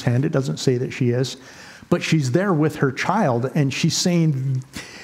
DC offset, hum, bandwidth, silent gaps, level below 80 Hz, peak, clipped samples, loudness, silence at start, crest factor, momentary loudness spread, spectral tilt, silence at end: under 0.1%; none; 15.5 kHz; none; -58 dBFS; -2 dBFS; under 0.1%; -21 LUFS; 0 s; 18 dB; 9 LU; -5.5 dB/octave; 0 s